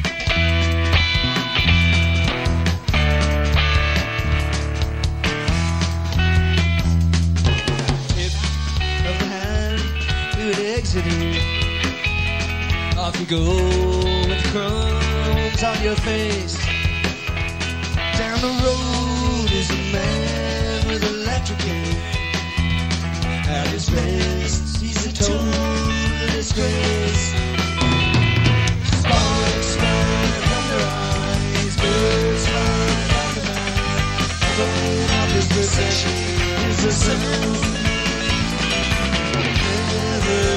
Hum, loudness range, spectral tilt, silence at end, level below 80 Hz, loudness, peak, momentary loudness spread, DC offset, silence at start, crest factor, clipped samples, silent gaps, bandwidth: none; 4 LU; -4.5 dB/octave; 0 s; -26 dBFS; -19 LUFS; -2 dBFS; 5 LU; 0.3%; 0 s; 16 dB; under 0.1%; none; 14 kHz